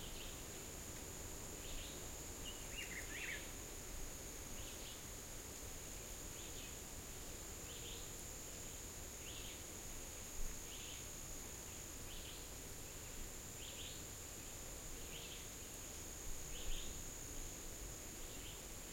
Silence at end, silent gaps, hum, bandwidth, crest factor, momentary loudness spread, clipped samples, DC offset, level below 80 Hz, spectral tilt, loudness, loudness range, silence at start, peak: 0 s; none; none; 16.5 kHz; 18 dB; 3 LU; under 0.1%; under 0.1%; -54 dBFS; -2 dB/octave; -49 LUFS; 2 LU; 0 s; -32 dBFS